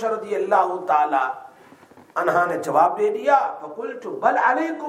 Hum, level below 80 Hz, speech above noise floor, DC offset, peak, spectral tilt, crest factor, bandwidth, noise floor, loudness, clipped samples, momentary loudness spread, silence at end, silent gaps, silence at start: none; -76 dBFS; 28 dB; under 0.1%; -4 dBFS; -5 dB/octave; 18 dB; 15 kHz; -48 dBFS; -21 LUFS; under 0.1%; 12 LU; 0 s; none; 0 s